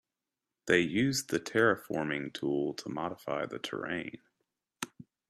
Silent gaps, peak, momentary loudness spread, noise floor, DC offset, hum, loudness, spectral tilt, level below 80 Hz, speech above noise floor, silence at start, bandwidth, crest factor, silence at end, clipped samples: none; -12 dBFS; 15 LU; -90 dBFS; under 0.1%; none; -32 LUFS; -4.5 dB/octave; -70 dBFS; 58 dB; 0.65 s; 14.5 kHz; 22 dB; 0.25 s; under 0.1%